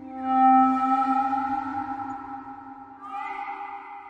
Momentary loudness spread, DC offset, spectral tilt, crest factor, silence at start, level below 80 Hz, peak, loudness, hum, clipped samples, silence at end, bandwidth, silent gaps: 21 LU; under 0.1%; -6 dB/octave; 16 dB; 0 s; -66 dBFS; -10 dBFS; -24 LUFS; none; under 0.1%; 0 s; 7.4 kHz; none